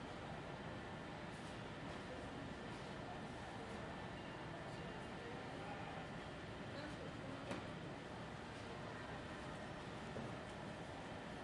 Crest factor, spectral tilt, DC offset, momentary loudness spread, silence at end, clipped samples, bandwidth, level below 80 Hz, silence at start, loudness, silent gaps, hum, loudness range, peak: 18 dB; -5.5 dB/octave; under 0.1%; 2 LU; 0 s; under 0.1%; 11.5 kHz; -66 dBFS; 0 s; -50 LUFS; none; none; 1 LU; -32 dBFS